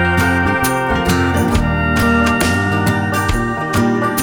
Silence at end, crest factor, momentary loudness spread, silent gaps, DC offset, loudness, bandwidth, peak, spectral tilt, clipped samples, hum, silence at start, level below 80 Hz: 0 s; 14 dB; 3 LU; none; under 0.1%; -15 LUFS; 19 kHz; -2 dBFS; -5.5 dB/octave; under 0.1%; none; 0 s; -26 dBFS